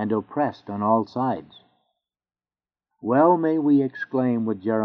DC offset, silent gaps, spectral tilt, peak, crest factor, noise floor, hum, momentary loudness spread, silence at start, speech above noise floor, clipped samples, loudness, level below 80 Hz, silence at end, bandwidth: under 0.1%; none; -7.5 dB/octave; -6 dBFS; 18 dB; under -90 dBFS; none; 9 LU; 0 s; over 68 dB; under 0.1%; -22 LUFS; -72 dBFS; 0 s; 5.6 kHz